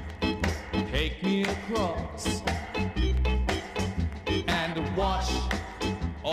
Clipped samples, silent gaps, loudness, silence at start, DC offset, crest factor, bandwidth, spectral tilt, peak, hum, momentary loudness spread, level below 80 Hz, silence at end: under 0.1%; none; -29 LUFS; 0 s; under 0.1%; 16 dB; 15 kHz; -5 dB/octave; -12 dBFS; none; 4 LU; -34 dBFS; 0 s